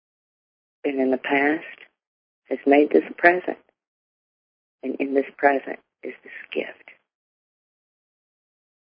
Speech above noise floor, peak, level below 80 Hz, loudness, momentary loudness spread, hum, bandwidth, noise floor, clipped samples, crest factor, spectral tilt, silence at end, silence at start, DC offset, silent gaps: over 68 dB; 0 dBFS; -76 dBFS; -22 LUFS; 19 LU; none; 5.2 kHz; under -90 dBFS; under 0.1%; 26 dB; -9 dB/octave; 2.15 s; 0.85 s; under 0.1%; 2.07-2.42 s, 3.87-4.79 s